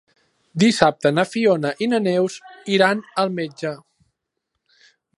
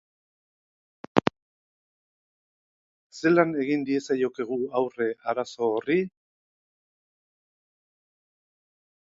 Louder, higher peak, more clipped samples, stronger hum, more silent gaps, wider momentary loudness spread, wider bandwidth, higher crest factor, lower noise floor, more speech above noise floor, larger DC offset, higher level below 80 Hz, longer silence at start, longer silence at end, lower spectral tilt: first, -20 LUFS vs -26 LUFS; about the same, 0 dBFS vs 0 dBFS; neither; neither; second, none vs 1.42-3.10 s; first, 13 LU vs 8 LU; first, 11.5 kHz vs 7.8 kHz; second, 20 dB vs 30 dB; second, -78 dBFS vs under -90 dBFS; second, 59 dB vs over 65 dB; neither; first, -60 dBFS vs -68 dBFS; second, 0.55 s vs 1.15 s; second, 1.4 s vs 2.95 s; second, -5 dB/octave vs -6.5 dB/octave